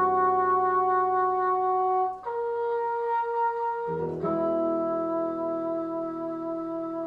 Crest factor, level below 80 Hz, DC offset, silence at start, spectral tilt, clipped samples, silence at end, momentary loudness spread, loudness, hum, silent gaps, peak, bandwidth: 12 dB; -66 dBFS; under 0.1%; 0 s; -9 dB/octave; under 0.1%; 0 s; 9 LU; -27 LUFS; none; none; -14 dBFS; 5.2 kHz